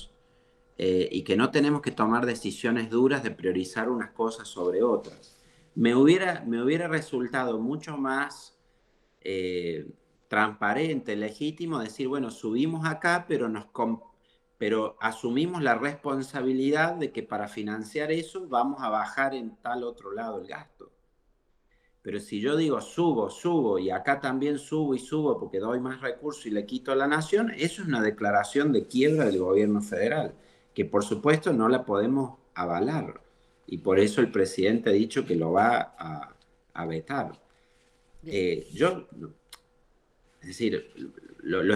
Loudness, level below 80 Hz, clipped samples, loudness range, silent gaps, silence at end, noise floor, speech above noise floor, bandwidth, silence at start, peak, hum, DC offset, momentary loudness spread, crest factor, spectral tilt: -27 LUFS; -66 dBFS; under 0.1%; 7 LU; none; 0 s; -68 dBFS; 41 dB; 12.5 kHz; 0 s; -8 dBFS; none; under 0.1%; 12 LU; 20 dB; -6 dB/octave